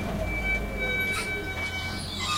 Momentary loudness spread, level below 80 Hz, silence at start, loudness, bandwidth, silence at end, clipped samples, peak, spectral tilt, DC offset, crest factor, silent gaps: 5 LU; -38 dBFS; 0 s; -28 LUFS; 16 kHz; 0 s; under 0.1%; -16 dBFS; -3.5 dB/octave; under 0.1%; 14 dB; none